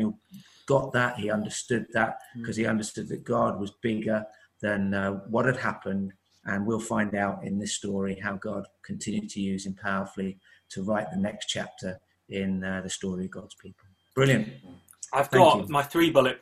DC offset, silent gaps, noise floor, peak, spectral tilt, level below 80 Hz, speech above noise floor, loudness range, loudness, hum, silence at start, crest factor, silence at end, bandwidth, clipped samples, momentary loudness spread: under 0.1%; none; -51 dBFS; -4 dBFS; -5 dB/octave; -62 dBFS; 24 dB; 6 LU; -28 LUFS; none; 0 s; 24 dB; 0.05 s; 15 kHz; under 0.1%; 14 LU